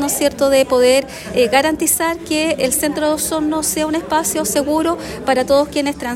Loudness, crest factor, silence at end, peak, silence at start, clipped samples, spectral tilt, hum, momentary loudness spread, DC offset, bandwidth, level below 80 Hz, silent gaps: -16 LUFS; 16 dB; 0 s; -2 dBFS; 0 s; under 0.1%; -2.5 dB/octave; none; 5 LU; under 0.1%; 16.5 kHz; -44 dBFS; none